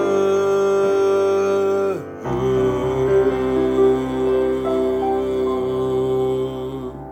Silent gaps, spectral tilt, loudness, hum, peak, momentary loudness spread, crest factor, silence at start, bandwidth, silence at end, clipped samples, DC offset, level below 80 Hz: none; -7 dB/octave; -19 LUFS; none; -6 dBFS; 7 LU; 12 dB; 0 s; 8.6 kHz; 0 s; under 0.1%; under 0.1%; -42 dBFS